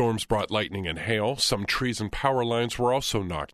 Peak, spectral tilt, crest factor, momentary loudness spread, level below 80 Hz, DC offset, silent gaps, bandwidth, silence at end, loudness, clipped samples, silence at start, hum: -10 dBFS; -4 dB/octave; 16 dB; 5 LU; -44 dBFS; under 0.1%; none; 13.5 kHz; 0.05 s; -26 LUFS; under 0.1%; 0 s; none